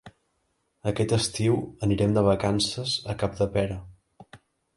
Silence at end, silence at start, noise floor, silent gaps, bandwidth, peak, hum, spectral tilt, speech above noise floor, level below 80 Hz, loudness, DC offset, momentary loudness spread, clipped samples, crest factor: 0.4 s; 0.05 s; -73 dBFS; none; 11.5 kHz; -8 dBFS; none; -5.5 dB/octave; 49 dB; -48 dBFS; -26 LUFS; under 0.1%; 9 LU; under 0.1%; 18 dB